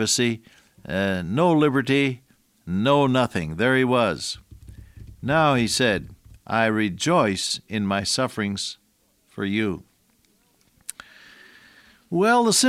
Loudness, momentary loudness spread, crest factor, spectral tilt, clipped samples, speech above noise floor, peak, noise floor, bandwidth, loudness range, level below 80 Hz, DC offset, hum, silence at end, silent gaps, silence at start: -22 LUFS; 15 LU; 18 dB; -4 dB/octave; under 0.1%; 43 dB; -6 dBFS; -64 dBFS; 16 kHz; 9 LU; -54 dBFS; under 0.1%; none; 0 s; none; 0 s